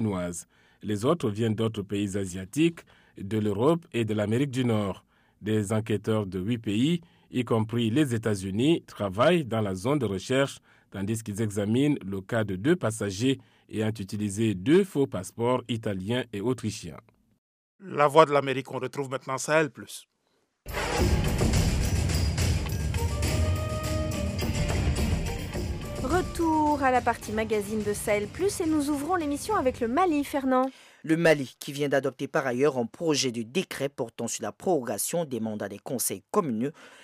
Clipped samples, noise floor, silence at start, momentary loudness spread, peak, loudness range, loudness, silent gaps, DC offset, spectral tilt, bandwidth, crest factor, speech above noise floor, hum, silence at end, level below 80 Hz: under 0.1%; -73 dBFS; 0 s; 9 LU; -4 dBFS; 3 LU; -27 LUFS; 17.38-17.79 s; under 0.1%; -5.5 dB/octave; 15.5 kHz; 24 dB; 46 dB; none; 0.1 s; -40 dBFS